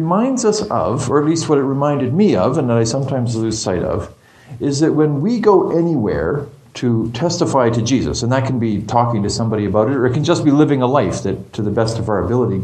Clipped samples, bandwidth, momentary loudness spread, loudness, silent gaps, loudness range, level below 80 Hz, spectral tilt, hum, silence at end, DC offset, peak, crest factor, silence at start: under 0.1%; 9.8 kHz; 7 LU; -16 LUFS; none; 2 LU; -42 dBFS; -6.5 dB/octave; none; 0 s; under 0.1%; 0 dBFS; 16 dB; 0 s